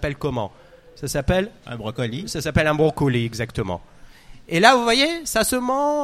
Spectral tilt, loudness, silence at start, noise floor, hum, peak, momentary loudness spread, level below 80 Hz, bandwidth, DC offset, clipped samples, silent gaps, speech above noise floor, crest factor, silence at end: -4.5 dB/octave; -21 LUFS; 0 s; -43 dBFS; none; 0 dBFS; 15 LU; -40 dBFS; 16 kHz; under 0.1%; under 0.1%; none; 22 dB; 22 dB; 0 s